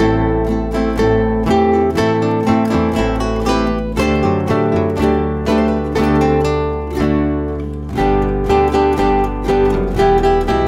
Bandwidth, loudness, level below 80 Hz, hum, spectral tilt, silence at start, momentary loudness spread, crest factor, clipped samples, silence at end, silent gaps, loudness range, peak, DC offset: 15 kHz; -15 LUFS; -24 dBFS; none; -7 dB/octave; 0 s; 5 LU; 12 dB; under 0.1%; 0 s; none; 1 LU; -2 dBFS; under 0.1%